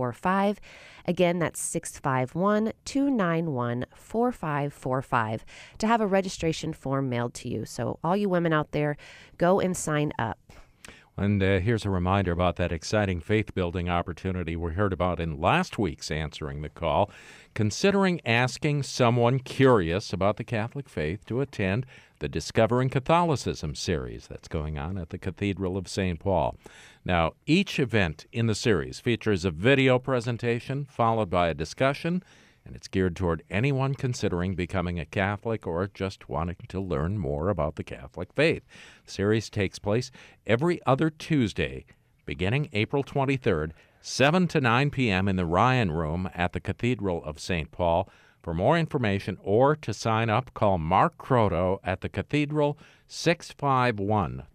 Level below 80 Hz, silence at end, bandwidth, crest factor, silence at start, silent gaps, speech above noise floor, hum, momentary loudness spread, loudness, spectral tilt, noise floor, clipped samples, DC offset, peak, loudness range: -48 dBFS; 0.1 s; 15 kHz; 16 dB; 0 s; none; 25 dB; none; 10 LU; -27 LUFS; -6 dB/octave; -51 dBFS; under 0.1%; under 0.1%; -10 dBFS; 4 LU